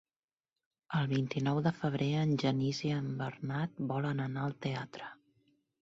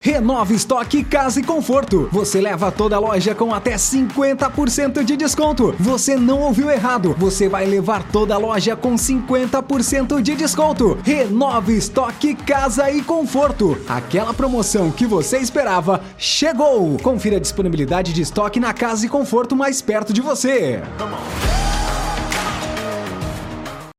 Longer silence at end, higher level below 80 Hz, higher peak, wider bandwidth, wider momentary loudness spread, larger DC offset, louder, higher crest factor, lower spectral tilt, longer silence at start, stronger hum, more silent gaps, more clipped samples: first, 0.7 s vs 0.05 s; second, -70 dBFS vs -32 dBFS; second, -18 dBFS vs -4 dBFS; second, 7.6 kHz vs 16 kHz; about the same, 7 LU vs 5 LU; neither; second, -34 LUFS vs -18 LUFS; about the same, 16 dB vs 14 dB; first, -7 dB/octave vs -4.5 dB/octave; first, 0.9 s vs 0.05 s; neither; neither; neither